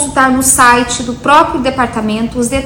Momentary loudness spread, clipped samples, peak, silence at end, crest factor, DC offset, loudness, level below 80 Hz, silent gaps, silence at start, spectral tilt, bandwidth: 9 LU; under 0.1%; 0 dBFS; 0 s; 10 dB; under 0.1%; -10 LUFS; -32 dBFS; none; 0 s; -3 dB/octave; 19 kHz